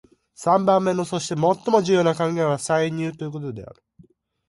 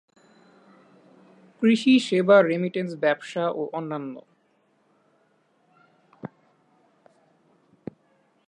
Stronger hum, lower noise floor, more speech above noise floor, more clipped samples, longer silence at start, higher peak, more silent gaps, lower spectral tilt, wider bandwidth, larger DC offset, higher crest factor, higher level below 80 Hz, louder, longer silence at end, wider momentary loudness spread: neither; second, -55 dBFS vs -66 dBFS; second, 34 dB vs 45 dB; neither; second, 0.4 s vs 1.6 s; about the same, -4 dBFS vs -6 dBFS; neither; about the same, -5.5 dB/octave vs -6 dB/octave; about the same, 11.5 kHz vs 10.5 kHz; neither; about the same, 20 dB vs 22 dB; first, -62 dBFS vs -78 dBFS; about the same, -21 LUFS vs -22 LUFS; second, 0.85 s vs 2.2 s; second, 13 LU vs 25 LU